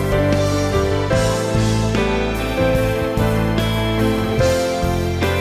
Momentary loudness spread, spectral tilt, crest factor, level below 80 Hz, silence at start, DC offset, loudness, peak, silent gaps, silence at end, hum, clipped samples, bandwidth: 2 LU; -6 dB/octave; 12 dB; -28 dBFS; 0 s; under 0.1%; -18 LUFS; -6 dBFS; none; 0 s; none; under 0.1%; 16 kHz